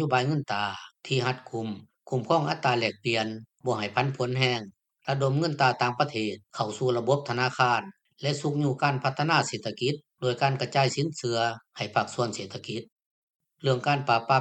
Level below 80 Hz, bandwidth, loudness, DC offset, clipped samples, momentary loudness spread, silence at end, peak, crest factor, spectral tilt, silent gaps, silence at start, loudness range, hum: -70 dBFS; 9 kHz; -27 LUFS; under 0.1%; under 0.1%; 10 LU; 0 s; -6 dBFS; 22 dB; -5 dB/octave; 12.92-12.96 s, 13.06-13.40 s; 0 s; 2 LU; none